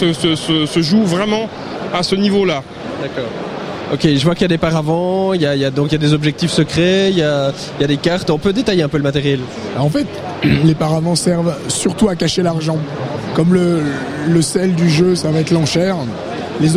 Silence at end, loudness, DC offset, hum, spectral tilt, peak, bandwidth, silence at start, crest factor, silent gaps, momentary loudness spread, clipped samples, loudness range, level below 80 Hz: 0 s; -15 LUFS; under 0.1%; none; -5.5 dB/octave; 0 dBFS; 14 kHz; 0 s; 14 dB; none; 9 LU; under 0.1%; 2 LU; -42 dBFS